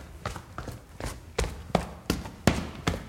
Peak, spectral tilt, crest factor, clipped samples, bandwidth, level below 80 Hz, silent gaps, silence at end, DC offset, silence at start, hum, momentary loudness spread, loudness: -4 dBFS; -5 dB/octave; 28 dB; under 0.1%; 16.5 kHz; -40 dBFS; none; 0 s; under 0.1%; 0 s; none; 13 LU; -32 LUFS